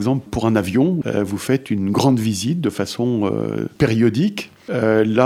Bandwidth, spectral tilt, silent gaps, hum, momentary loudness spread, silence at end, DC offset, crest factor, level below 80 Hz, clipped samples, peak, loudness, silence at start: 16 kHz; -6.5 dB/octave; none; none; 6 LU; 0 s; under 0.1%; 18 dB; -48 dBFS; under 0.1%; -2 dBFS; -19 LUFS; 0 s